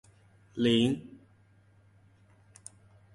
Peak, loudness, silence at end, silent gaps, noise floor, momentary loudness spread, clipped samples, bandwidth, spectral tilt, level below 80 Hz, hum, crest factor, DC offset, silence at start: -12 dBFS; -28 LUFS; 2.05 s; none; -62 dBFS; 25 LU; under 0.1%; 11.5 kHz; -5.5 dB/octave; -66 dBFS; none; 22 dB; under 0.1%; 0.55 s